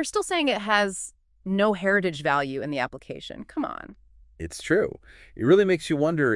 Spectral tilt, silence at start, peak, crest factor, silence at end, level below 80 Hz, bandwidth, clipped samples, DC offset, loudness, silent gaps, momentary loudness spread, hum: -5 dB/octave; 0 s; -6 dBFS; 18 dB; 0 s; -54 dBFS; 12 kHz; under 0.1%; under 0.1%; -24 LUFS; none; 17 LU; none